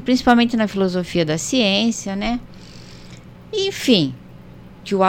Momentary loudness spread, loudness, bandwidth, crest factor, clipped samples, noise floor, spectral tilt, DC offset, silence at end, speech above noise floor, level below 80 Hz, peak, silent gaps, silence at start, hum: 24 LU; -19 LUFS; 16.5 kHz; 20 dB; under 0.1%; -40 dBFS; -4.5 dB/octave; under 0.1%; 0 s; 22 dB; -44 dBFS; 0 dBFS; none; 0 s; 60 Hz at -45 dBFS